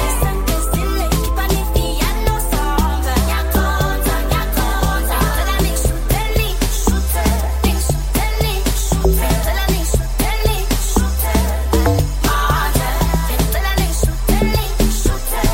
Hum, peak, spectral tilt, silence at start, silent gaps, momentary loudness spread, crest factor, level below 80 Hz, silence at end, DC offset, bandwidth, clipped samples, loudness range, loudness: none; -2 dBFS; -4.5 dB/octave; 0 s; none; 3 LU; 14 dB; -18 dBFS; 0 s; under 0.1%; 17 kHz; under 0.1%; 1 LU; -17 LUFS